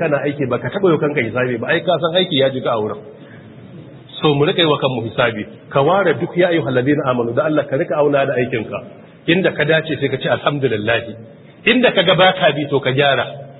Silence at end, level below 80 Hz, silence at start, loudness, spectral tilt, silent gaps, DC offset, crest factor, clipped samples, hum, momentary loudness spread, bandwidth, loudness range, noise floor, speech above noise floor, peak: 0 s; -56 dBFS; 0 s; -16 LUFS; -11 dB/octave; none; under 0.1%; 16 dB; under 0.1%; none; 8 LU; 4.1 kHz; 3 LU; -38 dBFS; 21 dB; 0 dBFS